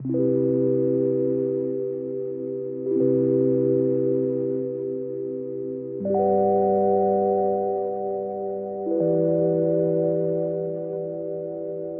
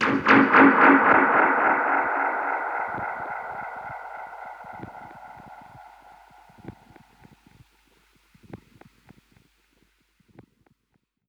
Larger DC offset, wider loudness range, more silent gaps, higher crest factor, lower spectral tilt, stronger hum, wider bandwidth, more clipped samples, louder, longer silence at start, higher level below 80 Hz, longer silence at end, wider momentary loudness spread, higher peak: neither; second, 1 LU vs 26 LU; neither; second, 14 dB vs 22 dB; first, -13.5 dB/octave vs -6.5 dB/octave; neither; second, 2.3 kHz vs 7 kHz; neither; second, -24 LUFS vs -19 LUFS; about the same, 0 s vs 0 s; about the same, -66 dBFS vs -64 dBFS; second, 0 s vs 2.75 s; second, 10 LU vs 25 LU; second, -10 dBFS vs -4 dBFS